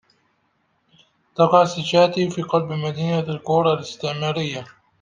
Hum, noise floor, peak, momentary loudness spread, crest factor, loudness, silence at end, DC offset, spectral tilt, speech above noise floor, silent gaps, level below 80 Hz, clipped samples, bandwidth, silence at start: none; -67 dBFS; -2 dBFS; 10 LU; 20 dB; -20 LUFS; 0.35 s; under 0.1%; -6 dB/octave; 47 dB; none; -64 dBFS; under 0.1%; 9.4 kHz; 1.4 s